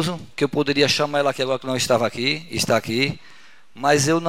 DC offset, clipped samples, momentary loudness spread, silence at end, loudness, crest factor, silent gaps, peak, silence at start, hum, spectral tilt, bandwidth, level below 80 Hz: 0.7%; under 0.1%; 7 LU; 0 s; -21 LUFS; 20 dB; none; -2 dBFS; 0 s; none; -4 dB/octave; 16 kHz; -56 dBFS